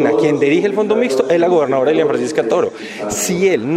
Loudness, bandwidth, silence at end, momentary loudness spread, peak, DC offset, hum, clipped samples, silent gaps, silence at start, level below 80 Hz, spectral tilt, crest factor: -15 LUFS; 16 kHz; 0 s; 5 LU; -2 dBFS; under 0.1%; none; under 0.1%; none; 0 s; -54 dBFS; -5 dB/octave; 12 dB